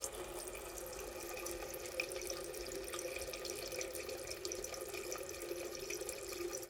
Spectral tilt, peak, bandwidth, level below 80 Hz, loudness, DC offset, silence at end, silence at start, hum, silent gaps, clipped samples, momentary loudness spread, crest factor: -2 dB/octave; -22 dBFS; 18 kHz; -62 dBFS; -44 LUFS; under 0.1%; 0 s; 0 s; none; none; under 0.1%; 4 LU; 22 dB